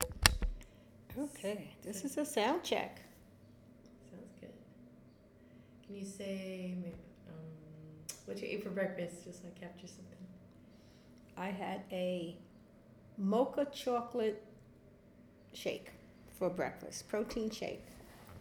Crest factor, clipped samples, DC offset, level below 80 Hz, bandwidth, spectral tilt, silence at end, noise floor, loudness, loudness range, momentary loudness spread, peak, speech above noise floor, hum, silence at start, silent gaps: 40 dB; under 0.1%; under 0.1%; -52 dBFS; over 20 kHz; -4 dB/octave; 0 s; -61 dBFS; -39 LUFS; 9 LU; 26 LU; -2 dBFS; 22 dB; none; 0 s; none